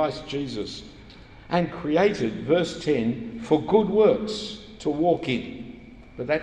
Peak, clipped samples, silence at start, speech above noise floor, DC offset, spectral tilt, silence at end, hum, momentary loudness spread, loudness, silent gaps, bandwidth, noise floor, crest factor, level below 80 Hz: -6 dBFS; under 0.1%; 0 s; 22 dB; under 0.1%; -6 dB/octave; 0 s; none; 17 LU; -24 LUFS; none; 9.8 kHz; -46 dBFS; 18 dB; -52 dBFS